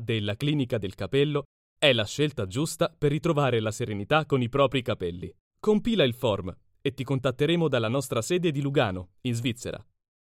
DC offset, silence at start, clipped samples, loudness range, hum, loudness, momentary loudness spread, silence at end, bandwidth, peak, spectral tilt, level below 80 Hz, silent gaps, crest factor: under 0.1%; 0 s; under 0.1%; 1 LU; none; -27 LUFS; 9 LU; 0.45 s; 16 kHz; -6 dBFS; -5.5 dB/octave; -54 dBFS; 1.45-1.76 s, 5.40-5.51 s; 22 dB